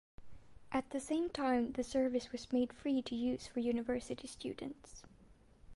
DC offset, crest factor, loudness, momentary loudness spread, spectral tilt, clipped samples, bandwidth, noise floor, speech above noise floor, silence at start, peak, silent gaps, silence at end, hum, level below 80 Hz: under 0.1%; 16 dB; -38 LUFS; 12 LU; -4.5 dB/octave; under 0.1%; 11.5 kHz; -63 dBFS; 26 dB; 0.2 s; -22 dBFS; none; 0 s; none; -62 dBFS